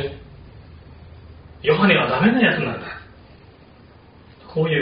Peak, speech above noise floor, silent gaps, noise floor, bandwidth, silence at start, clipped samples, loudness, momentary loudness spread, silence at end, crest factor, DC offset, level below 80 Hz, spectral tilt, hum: -2 dBFS; 30 dB; none; -47 dBFS; 5.2 kHz; 0 s; under 0.1%; -19 LUFS; 19 LU; 0 s; 20 dB; under 0.1%; -48 dBFS; -4 dB/octave; none